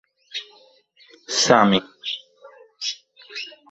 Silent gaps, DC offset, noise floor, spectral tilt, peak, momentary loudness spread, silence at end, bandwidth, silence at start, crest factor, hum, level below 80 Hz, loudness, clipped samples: none; under 0.1%; -55 dBFS; -3 dB/octave; -2 dBFS; 18 LU; 0.2 s; 8.2 kHz; 0.35 s; 24 dB; none; -62 dBFS; -21 LUFS; under 0.1%